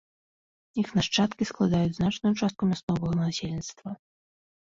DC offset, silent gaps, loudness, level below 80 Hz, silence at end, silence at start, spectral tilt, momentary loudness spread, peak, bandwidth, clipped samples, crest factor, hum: under 0.1%; 2.83-2.88 s; -27 LUFS; -54 dBFS; 0.75 s; 0.75 s; -5.5 dB/octave; 12 LU; -12 dBFS; 7.8 kHz; under 0.1%; 16 dB; none